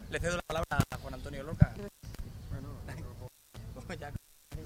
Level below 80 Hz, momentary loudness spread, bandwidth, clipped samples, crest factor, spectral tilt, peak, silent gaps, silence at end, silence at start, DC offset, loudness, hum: -44 dBFS; 19 LU; 16 kHz; under 0.1%; 28 dB; -6 dB/octave; -6 dBFS; none; 0 s; 0 s; under 0.1%; -36 LUFS; none